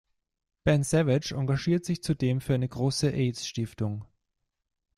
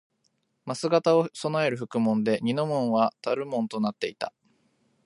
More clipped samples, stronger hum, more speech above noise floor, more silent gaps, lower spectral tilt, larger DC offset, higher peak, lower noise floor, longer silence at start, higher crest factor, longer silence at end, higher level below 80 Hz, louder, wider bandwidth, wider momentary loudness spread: neither; neither; first, 55 dB vs 47 dB; neither; about the same, -6 dB/octave vs -6 dB/octave; neither; about the same, -10 dBFS vs -8 dBFS; first, -81 dBFS vs -73 dBFS; about the same, 0.65 s vs 0.65 s; about the same, 18 dB vs 18 dB; first, 0.9 s vs 0.75 s; first, -54 dBFS vs -74 dBFS; about the same, -28 LUFS vs -26 LUFS; first, 13 kHz vs 11.5 kHz; about the same, 9 LU vs 9 LU